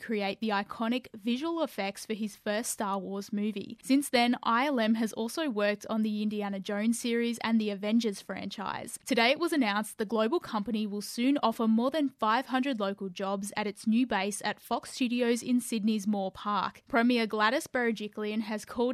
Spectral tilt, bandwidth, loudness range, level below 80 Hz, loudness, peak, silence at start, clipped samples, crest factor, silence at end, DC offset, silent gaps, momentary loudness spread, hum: -4 dB/octave; 15 kHz; 2 LU; -72 dBFS; -30 LUFS; -12 dBFS; 0 s; under 0.1%; 18 dB; 0 s; under 0.1%; none; 8 LU; none